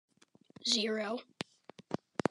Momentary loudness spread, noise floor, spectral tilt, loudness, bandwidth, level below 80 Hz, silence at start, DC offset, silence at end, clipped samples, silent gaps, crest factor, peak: 15 LU; -61 dBFS; -3 dB/octave; -36 LUFS; 12 kHz; -78 dBFS; 0.65 s; under 0.1%; 0.35 s; under 0.1%; none; 24 dB; -14 dBFS